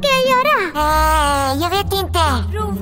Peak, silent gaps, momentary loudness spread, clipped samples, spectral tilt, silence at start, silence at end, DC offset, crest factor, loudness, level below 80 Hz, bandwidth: -2 dBFS; none; 5 LU; under 0.1%; -4 dB/octave; 0 s; 0 s; under 0.1%; 14 dB; -16 LUFS; -26 dBFS; 16.5 kHz